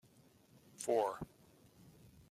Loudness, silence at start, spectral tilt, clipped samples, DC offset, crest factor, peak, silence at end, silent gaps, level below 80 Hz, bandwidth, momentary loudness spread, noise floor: -39 LUFS; 0.8 s; -4.5 dB/octave; under 0.1%; under 0.1%; 22 dB; -22 dBFS; 0.4 s; none; -72 dBFS; 15 kHz; 26 LU; -67 dBFS